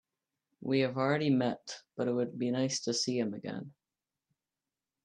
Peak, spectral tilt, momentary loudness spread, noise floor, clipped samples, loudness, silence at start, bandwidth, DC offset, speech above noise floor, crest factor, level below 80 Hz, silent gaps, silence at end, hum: -16 dBFS; -5 dB/octave; 14 LU; under -90 dBFS; under 0.1%; -32 LUFS; 0.6 s; 10.5 kHz; under 0.1%; over 58 dB; 18 dB; -78 dBFS; none; 1.35 s; none